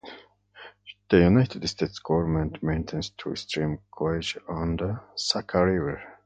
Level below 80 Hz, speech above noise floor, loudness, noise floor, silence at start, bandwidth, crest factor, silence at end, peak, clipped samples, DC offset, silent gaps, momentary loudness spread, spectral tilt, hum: -42 dBFS; 25 dB; -26 LUFS; -50 dBFS; 0.05 s; 9.2 kHz; 22 dB; 0.1 s; -6 dBFS; under 0.1%; under 0.1%; none; 12 LU; -6 dB/octave; 50 Hz at -50 dBFS